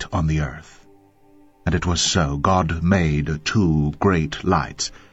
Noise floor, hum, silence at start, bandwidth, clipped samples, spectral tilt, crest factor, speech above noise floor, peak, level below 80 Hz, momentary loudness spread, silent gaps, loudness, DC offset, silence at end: -52 dBFS; none; 0 s; 8.2 kHz; under 0.1%; -5 dB/octave; 20 dB; 32 dB; -2 dBFS; -34 dBFS; 8 LU; none; -21 LUFS; under 0.1%; 0.2 s